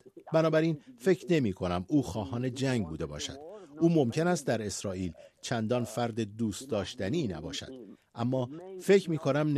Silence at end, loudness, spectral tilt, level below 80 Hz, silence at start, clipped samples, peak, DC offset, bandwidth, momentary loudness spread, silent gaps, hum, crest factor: 0 s; -31 LUFS; -6 dB/octave; -60 dBFS; 0.05 s; under 0.1%; -12 dBFS; under 0.1%; 13.5 kHz; 13 LU; none; none; 18 dB